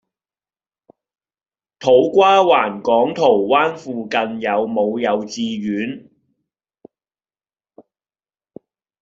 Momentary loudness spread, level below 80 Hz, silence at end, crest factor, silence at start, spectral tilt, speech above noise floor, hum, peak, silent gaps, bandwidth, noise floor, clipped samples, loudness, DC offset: 12 LU; -64 dBFS; 3 s; 18 dB; 1.8 s; -5 dB/octave; over 74 dB; none; -2 dBFS; none; 7.6 kHz; under -90 dBFS; under 0.1%; -17 LUFS; under 0.1%